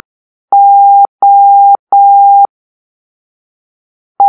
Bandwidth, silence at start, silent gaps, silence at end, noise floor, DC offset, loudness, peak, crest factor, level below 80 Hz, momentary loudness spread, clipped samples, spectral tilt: 1.5 kHz; 0.5 s; 1.09-1.19 s, 1.79-1.87 s, 2.49-4.15 s; 0 s; under -90 dBFS; under 0.1%; -6 LUFS; 0 dBFS; 8 dB; -84 dBFS; 4 LU; under 0.1%; -7 dB/octave